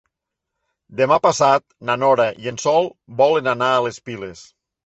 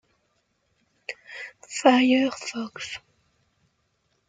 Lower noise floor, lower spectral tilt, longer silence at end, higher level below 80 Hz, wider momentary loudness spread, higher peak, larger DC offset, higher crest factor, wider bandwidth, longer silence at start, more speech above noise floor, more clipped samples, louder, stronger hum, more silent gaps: first, -81 dBFS vs -71 dBFS; about the same, -4 dB/octave vs -3 dB/octave; second, 0.45 s vs 1.3 s; first, -60 dBFS vs -72 dBFS; second, 16 LU vs 20 LU; about the same, -2 dBFS vs -4 dBFS; neither; second, 18 dB vs 24 dB; second, 8.2 kHz vs 9.4 kHz; second, 0.9 s vs 1.1 s; first, 63 dB vs 48 dB; neither; first, -18 LUFS vs -23 LUFS; neither; neither